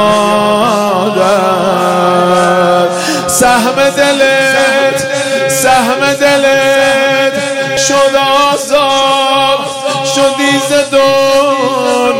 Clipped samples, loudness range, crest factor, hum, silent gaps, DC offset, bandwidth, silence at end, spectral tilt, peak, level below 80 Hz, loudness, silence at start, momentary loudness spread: under 0.1%; 1 LU; 10 dB; none; none; under 0.1%; 16.5 kHz; 0 s; -3 dB/octave; 0 dBFS; -46 dBFS; -9 LUFS; 0 s; 4 LU